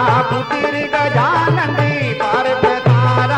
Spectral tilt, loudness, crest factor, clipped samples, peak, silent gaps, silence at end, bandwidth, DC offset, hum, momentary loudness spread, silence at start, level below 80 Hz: -7 dB/octave; -15 LUFS; 12 dB; under 0.1%; -2 dBFS; none; 0 s; 8.8 kHz; under 0.1%; none; 4 LU; 0 s; -46 dBFS